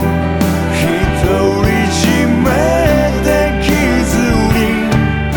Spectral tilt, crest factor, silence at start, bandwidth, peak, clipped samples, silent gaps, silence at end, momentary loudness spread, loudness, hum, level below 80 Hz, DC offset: -5.5 dB/octave; 10 dB; 0 s; 19.5 kHz; 0 dBFS; under 0.1%; none; 0 s; 2 LU; -13 LUFS; none; -22 dBFS; under 0.1%